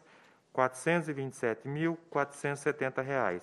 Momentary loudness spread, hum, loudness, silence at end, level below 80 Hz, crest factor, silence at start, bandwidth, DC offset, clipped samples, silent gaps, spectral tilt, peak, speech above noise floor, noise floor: 4 LU; none; -33 LUFS; 0 s; -76 dBFS; 22 dB; 0.55 s; 13 kHz; under 0.1%; under 0.1%; none; -6 dB/octave; -10 dBFS; 29 dB; -61 dBFS